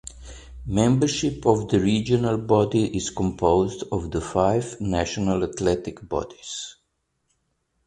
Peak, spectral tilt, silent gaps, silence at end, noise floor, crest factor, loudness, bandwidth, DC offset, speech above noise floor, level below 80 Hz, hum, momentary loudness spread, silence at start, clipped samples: -4 dBFS; -6 dB/octave; none; 1.15 s; -74 dBFS; 20 dB; -23 LUFS; 11 kHz; under 0.1%; 51 dB; -42 dBFS; none; 13 LU; 0.05 s; under 0.1%